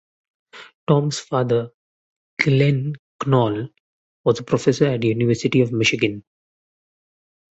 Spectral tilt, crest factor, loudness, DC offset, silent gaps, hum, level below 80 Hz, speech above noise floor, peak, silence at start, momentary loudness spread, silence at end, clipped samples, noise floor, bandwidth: -6 dB/octave; 20 dB; -20 LUFS; under 0.1%; 0.75-0.87 s, 1.74-2.37 s, 2.99-3.19 s, 3.80-4.24 s; none; -56 dBFS; over 71 dB; -2 dBFS; 0.55 s; 12 LU; 1.35 s; under 0.1%; under -90 dBFS; 8.2 kHz